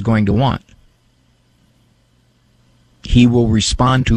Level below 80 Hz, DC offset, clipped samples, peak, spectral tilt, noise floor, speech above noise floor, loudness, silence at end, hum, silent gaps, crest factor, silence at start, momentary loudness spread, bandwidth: -30 dBFS; under 0.1%; under 0.1%; -2 dBFS; -6 dB/octave; -56 dBFS; 43 dB; -14 LUFS; 0 s; none; none; 16 dB; 0 s; 10 LU; 11 kHz